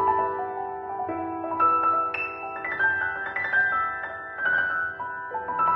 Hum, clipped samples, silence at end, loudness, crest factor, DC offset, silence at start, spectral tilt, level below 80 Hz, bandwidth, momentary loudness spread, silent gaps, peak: none; under 0.1%; 0 s; -26 LUFS; 16 dB; under 0.1%; 0 s; -7 dB/octave; -62 dBFS; 5.8 kHz; 10 LU; none; -10 dBFS